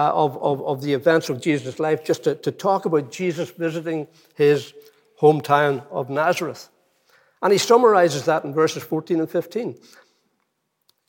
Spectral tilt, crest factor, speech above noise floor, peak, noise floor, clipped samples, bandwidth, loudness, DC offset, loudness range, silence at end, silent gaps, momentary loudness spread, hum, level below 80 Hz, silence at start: -5.5 dB/octave; 18 dB; 52 dB; -2 dBFS; -73 dBFS; under 0.1%; 17 kHz; -21 LUFS; under 0.1%; 3 LU; 1.35 s; none; 11 LU; none; -78 dBFS; 0 s